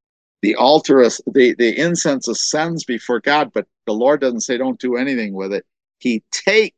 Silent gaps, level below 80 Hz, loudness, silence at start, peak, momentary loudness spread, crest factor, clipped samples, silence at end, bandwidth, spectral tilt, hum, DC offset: none; -68 dBFS; -17 LUFS; 0.45 s; 0 dBFS; 10 LU; 18 dB; under 0.1%; 0.1 s; 9.4 kHz; -3.5 dB/octave; none; under 0.1%